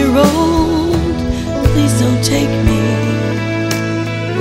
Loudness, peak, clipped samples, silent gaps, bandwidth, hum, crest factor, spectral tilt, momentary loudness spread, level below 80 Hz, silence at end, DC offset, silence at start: -14 LUFS; 0 dBFS; under 0.1%; none; 16 kHz; none; 14 dB; -6 dB/octave; 7 LU; -26 dBFS; 0 s; under 0.1%; 0 s